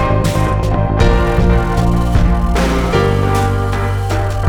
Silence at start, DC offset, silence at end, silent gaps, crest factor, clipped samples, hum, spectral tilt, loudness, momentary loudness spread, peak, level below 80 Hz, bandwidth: 0 s; under 0.1%; 0 s; none; 12 dB; under 0.1%; none; -7 dB/octave; -15 LUFS; 4 LU; 0 dBFS; -18 dBFS; 16.5 kHz